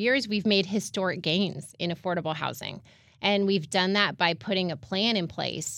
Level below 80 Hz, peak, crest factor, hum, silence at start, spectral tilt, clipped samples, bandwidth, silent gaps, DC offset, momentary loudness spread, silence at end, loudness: -66 dBFS; -6 dBFS; 20 dB; none; 0 s; -4 dB/octave; under 0.1%; 16 kHz; none; under 0.1%; 8 LU; 0 s; -27 LUFS